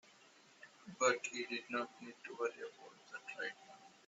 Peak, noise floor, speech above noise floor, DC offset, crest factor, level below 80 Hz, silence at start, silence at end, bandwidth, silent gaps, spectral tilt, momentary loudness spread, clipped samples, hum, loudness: -18 dBFS; -66 dBFS; 23 dB; under 0.1%; 24 dB; under -90 dBFS; 0.6 s; 0.15 s; 8 kHz; none; -1 dB/octave; 24 LU; under 0.1%; none; -41 LUFS